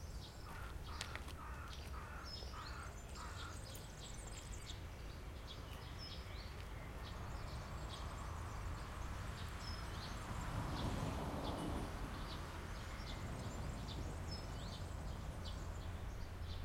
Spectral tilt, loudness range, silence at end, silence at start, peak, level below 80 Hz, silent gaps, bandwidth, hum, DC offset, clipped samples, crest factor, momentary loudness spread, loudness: -5 dB/octave; 5 LU; 0 s; 0 s; -22 dBFS; -52 dBFS; none; 16.5 kHz; none; under 0.1%; under 0.1%; 26 dB; 7 LU; -48 LUFS